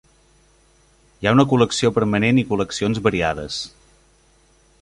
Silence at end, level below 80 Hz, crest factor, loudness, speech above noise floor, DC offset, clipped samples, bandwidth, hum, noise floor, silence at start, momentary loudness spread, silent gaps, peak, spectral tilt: 1.15 s; -46 dBFS; 20 dB; -19 LUFS; 38 dB; under 0.1%; under 0.1%; 11.5 kHz; none; -56 dBFS; 1.2 s; 11 LU; none; -2 dBFS; -5.5 dB/octave